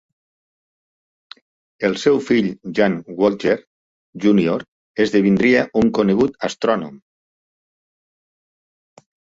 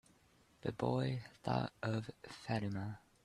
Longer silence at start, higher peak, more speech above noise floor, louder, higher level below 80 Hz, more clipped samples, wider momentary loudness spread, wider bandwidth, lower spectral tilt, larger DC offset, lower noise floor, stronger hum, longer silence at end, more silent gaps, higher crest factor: first, 1.8 s vs 0.65 s; first, -2 dBFS vs -20 dBFS; first, over 73 dB vs 30 dB; first, -18 LUFS vs -41 LUFS; first, -54 dBFS vs -68 dBFS; neither; about the same, 8 LU vs 10 LU; second, 7.8 kHz vs 12 kHz; about the same, -6.5 dB/octave vs -7 dB/octave; neither; first, under -90 dBFS vs -70 dBFS; neither; first, 2.4 s vs 0.25 s; first, 3.67-4.13 s, 4.68-4.95 s vs none; about the same, 18 dB vs 20 dB